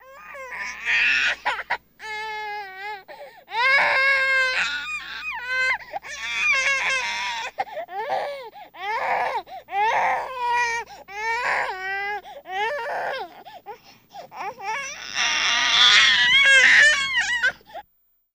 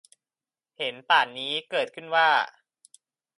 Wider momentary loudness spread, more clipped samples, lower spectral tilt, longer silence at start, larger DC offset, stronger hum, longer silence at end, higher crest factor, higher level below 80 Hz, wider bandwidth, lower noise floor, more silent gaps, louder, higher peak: first, 20 LU vs 11 LU; neither; second, 1 dB/octave vs -2 dB/octave; second, 0.05 s vs 0.8 s; neither; neither; second, 0.55 s vs 0.9 s; about the same, 20 dB vs 22 dB; first, -58 dBFS vs -86 dBFS; first, 15.5 kHz vs 11.5 kHz; second, -66 dBFS vs under -90 dBFS; neither; first, -20 LUFS vs -25 LUFS; first, -2 dBFS vs -6 dBFS